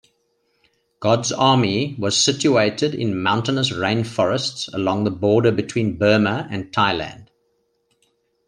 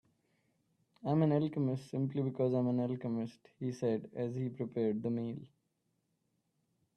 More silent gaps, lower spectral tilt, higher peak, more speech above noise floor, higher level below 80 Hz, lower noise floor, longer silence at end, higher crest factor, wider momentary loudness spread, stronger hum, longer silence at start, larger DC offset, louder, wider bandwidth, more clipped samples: neither; second, -4.5 dB/octave vs -9.5 dB/octave; first, -2 dBFS vs -18 dBFS; about the same, 48 dB vs 46 dB; first, -56 dBFS vs -76 dBFS; second, -68 dBFS vs -81 dBFS; second, 1.25 s vs 1.5 s; about the same, 18 dB vs 18 dB; second, 7 LU vs 11 LU; neither; about the same, 1 s vs 1.05 s; neither; first, -19 LUFS vs -36 LUFS; about the same, 10.5 kHz vs 9.6 kHz; neither